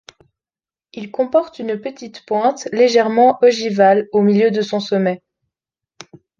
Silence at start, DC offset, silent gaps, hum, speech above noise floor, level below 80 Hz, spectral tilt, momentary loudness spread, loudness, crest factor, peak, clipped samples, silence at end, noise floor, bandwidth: 0.95 s; under 0.1%; none; none; over 75 dB; -66 dBFS; -5.5 dB/octave; 15 LU; -16 LUFS; 16 dB; 0 dBFS; under 0.1%; 1.25 s; under -90 dBFS; 7.4 kHz